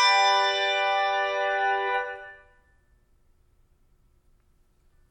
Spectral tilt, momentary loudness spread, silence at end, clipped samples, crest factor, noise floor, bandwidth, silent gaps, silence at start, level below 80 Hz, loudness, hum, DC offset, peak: 0.5 dB/octave; 15 LU; 2.75 s; under 0.1%; 18 dB; -63 dBFS; 11 kHz; none; 0 s; -64 dBFS; -24 LUFS; none; under 0.1%; -10 dBFS